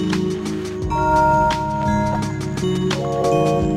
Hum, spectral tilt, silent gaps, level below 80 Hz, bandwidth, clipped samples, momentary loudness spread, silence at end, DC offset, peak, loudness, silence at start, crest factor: none; -6.5 dB/octave; none; -34 dBFS; 15 kHz; under 0.1%; 8 LU; 0 s; under 0.1%; -4 dBFS; -19 LUFS; 0 s; 14 dB